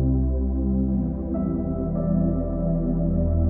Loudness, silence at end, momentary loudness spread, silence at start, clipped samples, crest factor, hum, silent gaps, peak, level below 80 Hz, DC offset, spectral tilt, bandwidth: -24 LUFS; 0 s; 3 LU; 0 s; under 0.1%; 12 dB; none; none; -10 dBFS; -28 dBFS; under 0.1%; -16 dB/octave; 2.1 kHz